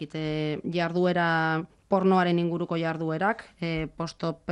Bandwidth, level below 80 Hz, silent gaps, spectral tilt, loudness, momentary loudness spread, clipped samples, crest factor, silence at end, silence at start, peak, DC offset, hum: 9.6 kHz; -56 dBFS; none; -7.5 dB/octave; -27 LUFS; 9 LU; under 0.1%; 16 dB; 0 s; 0 s; -10 dBFS; under 0.1%; none